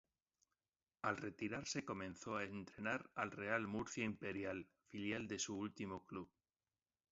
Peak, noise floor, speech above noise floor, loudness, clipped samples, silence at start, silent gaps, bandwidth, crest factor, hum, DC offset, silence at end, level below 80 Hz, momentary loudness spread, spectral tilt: -24 dBFS; under -90 dBFS; over 44 dB; -46 LUFS; under 0.1%; 1.05 s; none; 7.6 kHz; 24 dB; none; under 0.1%; 0.85 s; -74 dBFS; 8 LU; -4 dB/octave